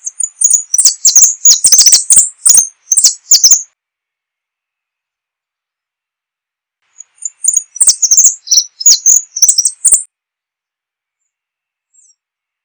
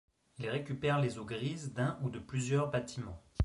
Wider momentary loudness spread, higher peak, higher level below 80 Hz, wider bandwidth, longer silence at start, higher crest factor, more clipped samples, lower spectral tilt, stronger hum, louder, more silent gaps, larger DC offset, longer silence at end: second, 8 LU vs 11 LU; first, 0 dBFS vs -20 dBFS; about the same, -56 dBFS vs -54 dBFS; first, over 20 kHz vs 11.5 kHz; second, 0.05 s vs 0.4 s; about the same, 12 dB vs 16 dB; first, 2% vs under 0.1%; second, 4.5 dB/octave vs -6 dB/octave; neither; first, -5 LUFS vs -36 LUFS; neither; neither; first, 2.6 s vs 0 s